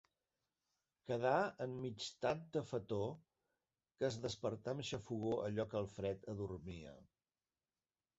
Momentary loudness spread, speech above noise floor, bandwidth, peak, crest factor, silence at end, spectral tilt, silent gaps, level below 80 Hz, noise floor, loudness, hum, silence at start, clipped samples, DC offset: 11 LU; over 48 dB; 8 kHz; -22 dBFS; 22 dB; 1.15 s; -5 dB/octave; none; -68 dBFS; under -90 dBFS; -42 LUFS; none; 1.05 s; under 0.1%; under 0.1%